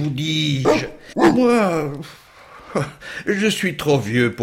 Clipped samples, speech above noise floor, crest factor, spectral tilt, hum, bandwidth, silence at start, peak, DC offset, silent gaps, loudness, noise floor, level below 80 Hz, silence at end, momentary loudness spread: under 0.1%; 23 dB; 16 dB; -5.5 dB/octave; none; 16.5 kHz; 0 s; -4 dBFS; under 0.1%; none; -19 LUFS; -41 dBFS; -50 dBFS; 0 s; 13 LU